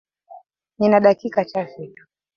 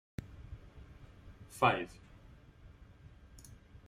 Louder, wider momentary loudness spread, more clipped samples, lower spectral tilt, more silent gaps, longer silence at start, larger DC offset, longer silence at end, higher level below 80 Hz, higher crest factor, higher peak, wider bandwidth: first, -18 LUFS vs -34 LUFS; second, 22 LU vs 28 LU; neither; first, -8 dB/octave vs -5 dB/octave; neither; first, 0.35 s vs 0.2 s; neither; first, 0.5 s vs 0.1 s; second, -64 dBFS vs -58 dBFS; second, 20 dB vs 28 dB; first, -2 dBFS vs -12 dBFS; second, 6.6 kHz vs 16 kHz